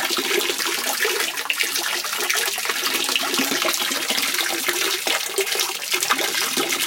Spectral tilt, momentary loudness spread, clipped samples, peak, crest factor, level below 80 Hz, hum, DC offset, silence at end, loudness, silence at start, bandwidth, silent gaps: 0.5 dB/octave; 2 LU; under 0.1%; 0 dBFS; 22 dB; -74 dBFS; none; under 0.1%; 0 s; -20 LUFS; 0 s; 17.5 kHz; none